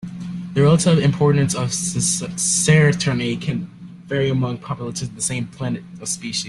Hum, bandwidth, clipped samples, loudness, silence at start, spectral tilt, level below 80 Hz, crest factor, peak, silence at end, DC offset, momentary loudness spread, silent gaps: none; 12.5 kHz; under 0.1%; -19 LUFS; 0 s; -4.5 dB/octave; -50 dBFS; 16 dB; -4 dBFS; 0 s; under 0.1%; 13 LU; none